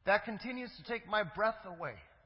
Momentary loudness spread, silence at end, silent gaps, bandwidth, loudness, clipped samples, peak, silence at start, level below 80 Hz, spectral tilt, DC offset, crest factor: 11 LU; 0.2 s; none; 5.6 kHz; -37 LUFS; under 0.1%; -16 dBFS; 0.05 s; -66 dBFS; -2.5 dB/octave; under 0.1%; 20 dB